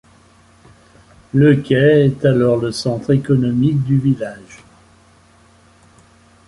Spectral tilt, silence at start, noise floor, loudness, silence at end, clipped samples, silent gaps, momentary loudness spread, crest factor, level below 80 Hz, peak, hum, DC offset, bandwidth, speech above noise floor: -8 dB/octave; 1.35 s; -50 dBFS; -15 LUFS; 1.9 s; under 0.1%; none; 9 LU; 16 dB; -48 dBFS; -2 dBFS; none; under 0.1%; 11.5 kHz; 36 dB